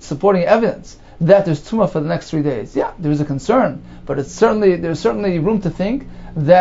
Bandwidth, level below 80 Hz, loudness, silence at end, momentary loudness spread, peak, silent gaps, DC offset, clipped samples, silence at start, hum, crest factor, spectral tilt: 8 kHz; -40 dBFS; -17 LUFS; 0 s; 10 LU; 0 dBFS; none; under 0.1%; under 0.1%; 0 s; none; 16 dB; -7.5 dB/octave